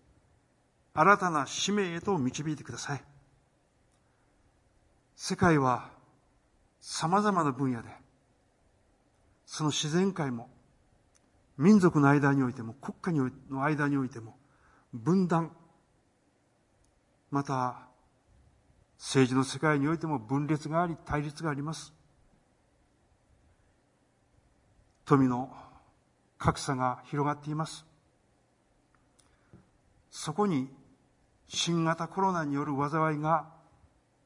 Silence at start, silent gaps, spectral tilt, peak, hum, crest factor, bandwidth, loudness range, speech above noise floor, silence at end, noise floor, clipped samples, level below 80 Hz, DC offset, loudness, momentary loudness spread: 0.95 s; none; -5.5 dB/octave; -8 dBFS; none; 24 dB; 11.5 kHz; 10 LU; 41 dB; 0.75 s; -70 dBFS; under 0.1%; -62 dBFS; under 0.1%; -29 LUFS; 16 LU